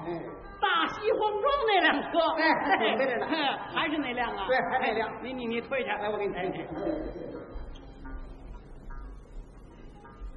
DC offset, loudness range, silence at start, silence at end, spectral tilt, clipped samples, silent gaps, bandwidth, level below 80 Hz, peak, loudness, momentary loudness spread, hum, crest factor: under 0.1%; 14 LU; 0 s; 0 s; -6 dB/octave; under 0.1%; none; 6.8 kHz; -48 dBFS; -12 dBFS; -28 LUFS; 22 LU; none; 18 dB